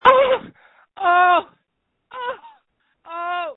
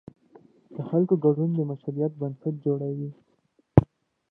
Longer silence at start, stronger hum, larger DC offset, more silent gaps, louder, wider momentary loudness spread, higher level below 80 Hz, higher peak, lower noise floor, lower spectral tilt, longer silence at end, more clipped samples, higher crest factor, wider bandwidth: second, 0.05 s vs 0.7 s; neither; neither; neither; first, -19 LUFS vs -26 LUFS; first, 20 LU vs 15 LU; second, -60 dBFS vs -46 dBFS; about the same, 0 dBFS vs 0 dBFS; first, -74 dBFS vs -68 dBFS; second, -5.5 dB/octave vs -12.5 dB/octave; second, 0.05 s vs 0.45 s; neither; second, 20 dB vs 26 dB; first, 4.1 kHz vs 3.7 kHz